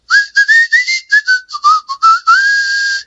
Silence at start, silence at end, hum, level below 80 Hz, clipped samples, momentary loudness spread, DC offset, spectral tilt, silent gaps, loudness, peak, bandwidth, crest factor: 0.1 s; 0.05 s; none; -66 dBFS; under 0.1%; 4 LU; under 0.1%; 5.5 dB/octave; none; -9 LUFS; 0 dBFS; 8 kHz; 10 dB